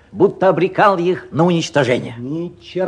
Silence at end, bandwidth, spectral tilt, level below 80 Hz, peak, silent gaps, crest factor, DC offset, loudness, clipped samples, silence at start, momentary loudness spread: 0 s; 10 kHz; -6 dB/octave; -54 dBFS; 0 dBFS; none; 16 dB; under 0.1%; -16 LUFS; under 0.1%; 0.15 s; 12 LU